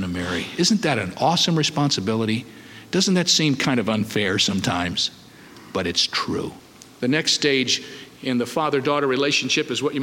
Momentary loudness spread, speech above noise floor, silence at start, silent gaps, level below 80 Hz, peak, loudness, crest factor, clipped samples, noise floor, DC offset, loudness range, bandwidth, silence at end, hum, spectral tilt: 9 LU; 23 dB; 0 s; none; -56 dBFS; -6 dBFS; -21 LUFS; 16 dB; under 0.1%; -44 dBFS; under 0.1%; 2 LU; 17 kHz; 0 s; none; -3.5 dB/octave